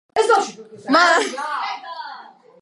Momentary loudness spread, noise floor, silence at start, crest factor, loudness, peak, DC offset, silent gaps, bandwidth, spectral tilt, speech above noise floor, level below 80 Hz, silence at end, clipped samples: 21 LU; -41 dBFS; 0.15 s; 18 dB; -18 LUFS; -2 dBFS; under 0.1%; none; 11.5 kHz; -1.5 dB/octave; 23 dB; -70 dBFS; 0.35 s; under 0.1%